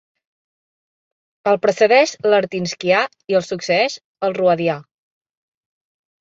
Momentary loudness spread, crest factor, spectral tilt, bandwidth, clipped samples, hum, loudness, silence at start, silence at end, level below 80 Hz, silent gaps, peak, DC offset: 10 LU; 18 dB; -4.5 dB/octave; 7.8 kHz; under 0.1%; none; -18 LUFS; 1.45 s; 1.4 s; -66 dBFS; 4.04-4.15 s; -2 dBFS; under 0.1%